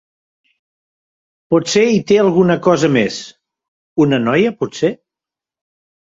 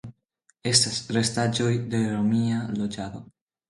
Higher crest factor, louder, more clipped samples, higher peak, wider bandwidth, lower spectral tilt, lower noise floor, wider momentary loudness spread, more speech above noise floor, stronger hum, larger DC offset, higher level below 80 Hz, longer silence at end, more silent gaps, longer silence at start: second, 16 dB vs 22 dB; first, -14 LUFS vs -24 LUFS; neither; about the same, -2 dBFS vs -4 dBFS; second, 8 kHz vs 11.5 kHz; first, -5.5 dB/octave vs -4 dB/octave; first, -87 dBFS vs -68 dBFS; second, 10 LU vs 13 LU; first, 74 dB vs 43 dB; neither; neither; about the same, -56 dBFS vs -58 dBFS; first, 1.1 s vs 0.45 s; first, 3.68-3.96 s vs none; first, 1.5 s vs 0.05 s